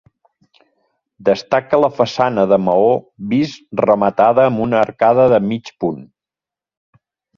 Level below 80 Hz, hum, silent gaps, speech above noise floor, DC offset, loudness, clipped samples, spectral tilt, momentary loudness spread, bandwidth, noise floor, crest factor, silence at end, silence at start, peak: -54 dBFS; none; none; 74 dB; under 0.1%; -15 LUFS; under 0.1%; -7 dB/octave; 9 LU; 7.2 kHz; -89 dBFS; 16 dB; 1.35 s; 1.2 s; 0 dBFS